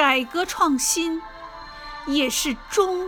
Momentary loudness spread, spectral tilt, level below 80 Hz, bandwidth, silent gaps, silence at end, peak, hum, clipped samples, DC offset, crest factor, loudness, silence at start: 18 LU; -1 dB/octave; -48 dBFS; 17.5 kHz; none; 0 s; -6 dBFS; none; under 0.1%; under 0.1%; 18 dB; -22 LUFS; 0 s